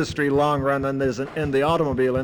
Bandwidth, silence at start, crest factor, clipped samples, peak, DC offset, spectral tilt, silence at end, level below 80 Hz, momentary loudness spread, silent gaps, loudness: 19.5 kHz; 0 s; 12 dB; under 0.1%; -10 dBFS; under 0.1%; -6.5 dB/octave; 0 s; -44 dBFS; 4 LU; none; -22 LUFS